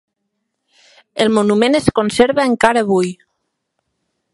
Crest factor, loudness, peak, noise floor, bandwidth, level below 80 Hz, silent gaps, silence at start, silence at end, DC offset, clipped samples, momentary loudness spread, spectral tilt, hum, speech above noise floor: 16 dB; -14 LUFS; 0 dBFS; -73 dBFS; 11.5 kHz; -46 dBFS; none; 1.15 s; 1.2 s; under 0.1%; under 0.1%; 5 LU; -5 dB/octave; none; 59 dB